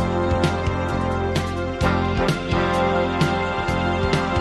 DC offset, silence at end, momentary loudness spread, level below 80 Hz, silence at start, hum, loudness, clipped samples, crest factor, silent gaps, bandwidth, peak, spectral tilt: under 0.1%; 0 s; 3 LU; -34 dBFS; 0 s; none; -22 LUFS; under 0.1%; 16 dB; none; 12.5 kHz; -4 dBFS; -6.5 dB/octave